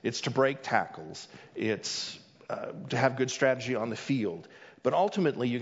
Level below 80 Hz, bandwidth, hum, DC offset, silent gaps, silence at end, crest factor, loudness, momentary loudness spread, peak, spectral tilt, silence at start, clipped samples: -74 dBFS; 7.8 kHz; none; under 0.1%; none; 0 s; 20 dB; -30 LUFS; 15 LU; -10 dBFS; -5 dB/octave; 0.05 s; under 0.1%